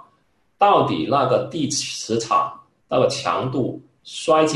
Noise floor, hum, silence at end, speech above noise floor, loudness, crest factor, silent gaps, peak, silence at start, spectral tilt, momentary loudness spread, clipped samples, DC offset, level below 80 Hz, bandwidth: -64 dBFS; none; 0 s; 45 dB; -20 LUFS; 16 dB; none; -4 dBFS; 0.6 s; -4.5 dB/octave; 11 LU; under 0.1%; under 0.1%; -58 dBFS; 12 kHz